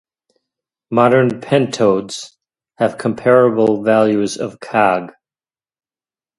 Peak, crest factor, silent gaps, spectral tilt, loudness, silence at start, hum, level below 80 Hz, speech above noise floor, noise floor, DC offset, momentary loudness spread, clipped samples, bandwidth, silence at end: 0 dBFS; 16 dB; none; -6 dB/octave; -15 LUFS; 0.9 s; none; -60 dBFS; over 76 dB; under -90 dBFS; under 0.1%; 12 LU; under 0.1%; 11.5 kHz; 1.3 s